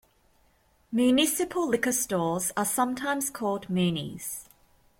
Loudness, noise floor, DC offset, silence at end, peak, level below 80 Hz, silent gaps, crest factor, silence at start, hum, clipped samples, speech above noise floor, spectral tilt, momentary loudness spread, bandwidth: -27 LUFS; -65 dBFS; under 0.1%; 0.55 s; -10 dBFS; -62 dBFS; none; 18 dB; 0.9 s; none; under 0.1%; 38 dB; -4 dB/octave; 10 LU; 16.5 kHz